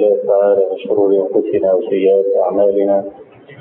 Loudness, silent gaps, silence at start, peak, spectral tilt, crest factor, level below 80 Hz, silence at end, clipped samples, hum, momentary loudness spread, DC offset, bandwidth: -14 LUFS; none; 0 s; -2 dBFS; -11.5 dB/octave; 12 dB; -60 dBFS; 0.05 s; under 0.1%; none; 4 LU; under 0.1%; 3.6 kHz